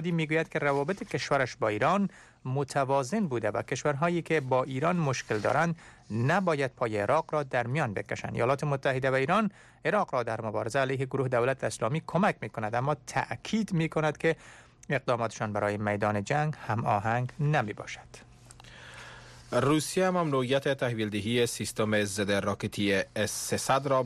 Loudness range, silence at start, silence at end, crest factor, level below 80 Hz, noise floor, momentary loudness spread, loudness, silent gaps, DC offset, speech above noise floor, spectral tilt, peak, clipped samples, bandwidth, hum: 2 LU; 0 s; 0 s; 14 dB; -62 dBFS; -51 dBFS; 6 LU; -29 LUFS; none; under 0.1%; 22 dB; -5.5 dB/octave; -14 dBFS; under 0.1%; 13.5 kHz; none